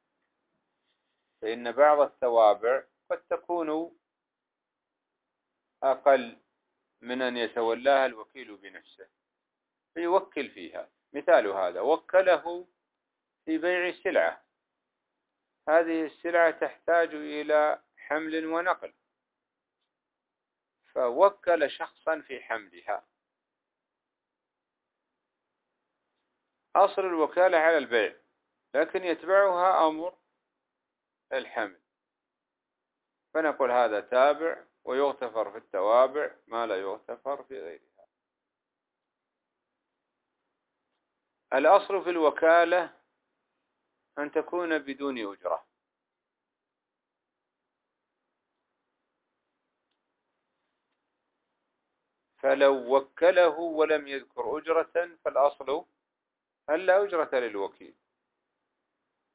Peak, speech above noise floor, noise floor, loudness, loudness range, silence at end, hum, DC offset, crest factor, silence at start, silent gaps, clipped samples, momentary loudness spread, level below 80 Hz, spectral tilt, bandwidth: -6 dBFS; 61 dB; -88 dBFS; -27 LUFS; 10 LU; 1.5 s; none; under 0.1%; 22 dB; 1.4 s; none; under 0.1%; 15 LU; -80 dBFS; -7 dB/octave; 4 kHz